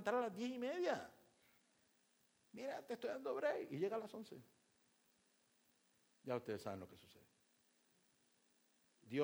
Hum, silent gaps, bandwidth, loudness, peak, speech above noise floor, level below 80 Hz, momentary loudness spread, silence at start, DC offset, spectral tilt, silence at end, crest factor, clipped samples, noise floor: none; none; over 20 kHz; -45 LUFS; -26 dBFS; 34 dB; -90 dBFS; 18 LU; 0 s; under 0.1%; -5.5 dB/octave; 0 s; 22 dB; under 0.1%; -79 dBFS